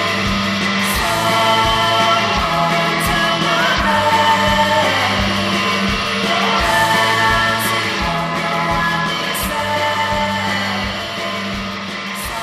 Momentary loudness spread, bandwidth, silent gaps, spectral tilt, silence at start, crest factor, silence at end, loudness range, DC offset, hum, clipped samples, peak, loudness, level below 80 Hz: 8 LU; 14 kHz; none; -3.5 dB/octave; 0 s; 16 dB; 0 s; 4 LU; under 0.1%; none; under 0.1%; 0 dBFS; -15 LUFS; -34 dBFS